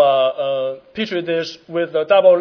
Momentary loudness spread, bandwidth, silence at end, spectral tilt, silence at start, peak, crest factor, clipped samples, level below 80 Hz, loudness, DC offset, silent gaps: 12 LU; 5.4 kHz; 0 s; -5.5 dB/octave; 0 s; -2 dBFS; 16 dB; under 0.1%; -66 dBFS; -18 LUFS; under 0.1%; none